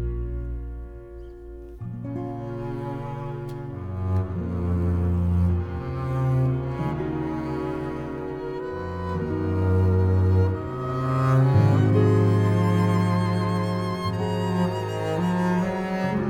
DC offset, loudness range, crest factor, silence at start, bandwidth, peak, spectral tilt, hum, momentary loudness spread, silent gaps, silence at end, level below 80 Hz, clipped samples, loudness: under 0.1%; 11 LU; 16 dB; 0 s; 10 kHz; -8 dBFS; -8.5 dB/octave; none; 14 LU; none; 0 s; -40 dBFS; under 0.1%; -25 LUFS